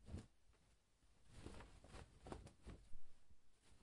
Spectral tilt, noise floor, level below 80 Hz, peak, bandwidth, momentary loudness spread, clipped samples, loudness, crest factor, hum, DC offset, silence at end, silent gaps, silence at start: -5.5 dB/octave; -77 dBFS; -64 dBFS; -36 dBFS; 11 kHz; 5 LU; under 0.1%; -61 LUFS; 20 dB; none; under 0.1%; 0 s; none; 0 s